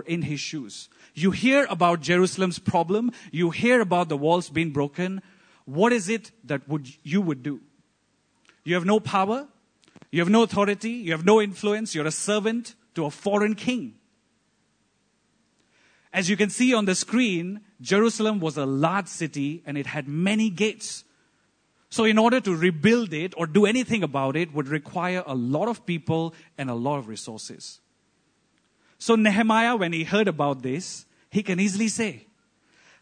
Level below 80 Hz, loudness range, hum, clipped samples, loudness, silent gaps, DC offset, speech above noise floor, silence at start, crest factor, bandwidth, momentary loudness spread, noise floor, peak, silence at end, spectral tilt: -68 dBFS; 6 LU; none; under 0.1%; -24 LUFS; none; under 0.1%; 45 dB; 0 s; 20 dB; 9.6 kHz; 13 LU; -69 dBFS; -4 dBFS; 0.8 s; -5 dB/octave